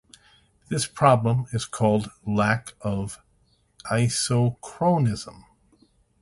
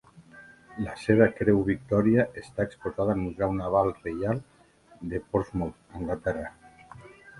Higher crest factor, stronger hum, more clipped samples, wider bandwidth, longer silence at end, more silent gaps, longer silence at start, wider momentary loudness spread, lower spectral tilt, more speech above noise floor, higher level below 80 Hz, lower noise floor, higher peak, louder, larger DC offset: about the same, 20 dB vs 24 dB; neither; neither; about the same, 11.5 kHz vs 11.5 kHz; first, 0.8 s vs 0 s; neither; first, 0.7 s vs 0.15 s; about the same, 13 LU vs 14 LU; second, -5.5 dB/octave vs -8.5 dB/octave; first, 41 dB vs 30 dB; about the same, -52 dBFS vs -50 dBFS; first, -64 dBFS vs -57 dBFS; about the same, -4 dBFS vs -4 dBFS; first, -24 LUFS vs -27 LUFS; neither